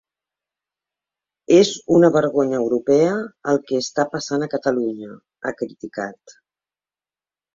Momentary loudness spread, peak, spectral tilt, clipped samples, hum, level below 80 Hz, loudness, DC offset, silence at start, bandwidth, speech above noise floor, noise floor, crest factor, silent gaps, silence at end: 15 LU; -2 dBFS; -5.5 dB/octave; under 0.1%; 50 Hz at -50 dBFS; -62 dBFS; -19 LUFS; under 0.1%; 1.5 s; 7.6 kHz; over 71 dB; under -90 dBFS; 18 dB; none; 1.25 s